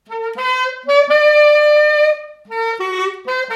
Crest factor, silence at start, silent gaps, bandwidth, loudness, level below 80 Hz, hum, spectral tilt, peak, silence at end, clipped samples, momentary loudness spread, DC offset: 14 dB; 0.1 s; none; 8.4 kHz; -14 LUFS; -72 dBFS; none; -1 dB/octave; -2 dBFS; 0 s; under 0.1%; 12 LU; under 0.1%